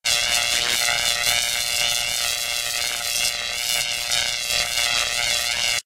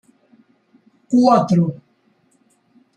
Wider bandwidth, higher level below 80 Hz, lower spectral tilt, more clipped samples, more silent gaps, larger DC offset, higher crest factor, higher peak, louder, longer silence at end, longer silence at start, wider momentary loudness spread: first, 16.5 kHz vs 9.4 kHz; first, -48 dBFS vs -64 dBFS; second, 1.5 dB/octave vs -8 dB/octave; neither; neither; neither; about the same, 20 dB vs 18 dB; about the same, -2 dBFS vs -2 dBFS; second, -20 LUFS vs -16 LUFS; second, 0.05 s vs 1.25 s; second, 0.05 s vs 1.1 s; second, 3 LU vs 12 LU